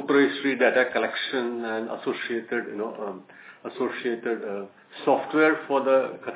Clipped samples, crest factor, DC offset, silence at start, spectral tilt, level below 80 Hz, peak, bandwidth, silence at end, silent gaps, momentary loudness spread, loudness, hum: under 0.1%; 18 dB; under 0.1%; 0 s; -8.5 dB/octave; -82 dBFS; -8 dBFS; 4 kHz; 0 s; none; 15 LU; -25 LUFS; none